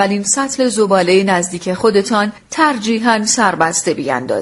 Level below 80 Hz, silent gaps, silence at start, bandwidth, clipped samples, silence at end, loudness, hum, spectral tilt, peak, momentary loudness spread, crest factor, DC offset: -54 dBFS; none; 0 s; 11.5 kHz; under 0.1%; 0 s; -14 LUFS; none; -3.5 dB/octave; 0 dBFS; 5 LU; 14 dB; under 0.1%